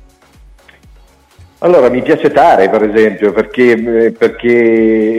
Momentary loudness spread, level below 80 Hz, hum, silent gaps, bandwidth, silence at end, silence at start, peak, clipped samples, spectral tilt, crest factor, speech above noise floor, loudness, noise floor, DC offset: 5 LU; -44 dBFS; none; none; 10.5 kHz; 0 s; 1.6 s; 0 dBFS; under 0.1%; -7 dB/octave; 10 dB; 34 dB; -10 LUFS; -43 dBFS; under 0.1%